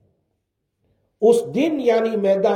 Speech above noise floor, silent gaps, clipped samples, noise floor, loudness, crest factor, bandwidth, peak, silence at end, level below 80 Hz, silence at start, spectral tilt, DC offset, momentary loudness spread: 57 dB; none; under 0.1%; -75 dBFS; -19 LUFS; 16 dB; 14.5 kHz; -4 dBFS; 0 s; -68 dBFS; 1.2 s; -6 dB/octave; under 0.1%; 2 LU